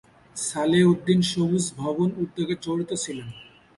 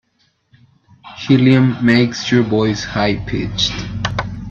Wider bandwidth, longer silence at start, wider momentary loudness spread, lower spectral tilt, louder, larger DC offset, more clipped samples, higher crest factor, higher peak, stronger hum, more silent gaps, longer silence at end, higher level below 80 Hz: first, 11.5 kHz vs 7.4 kHz; second, 0.35 s vs 1.05 s; about the same, 12 LU vs 10 LU; about the same, -5 dB/octave vs -6 dB/octave; second, -24 LUFS vs -16 LUFS; neither; neither; about the same, 16 dB vs 16 dB; second, -8 dBFS vs 0 dBFS; neither; neither; first, 0.35 s vs 0 s; second, -58 dBFS vs -38 dBFS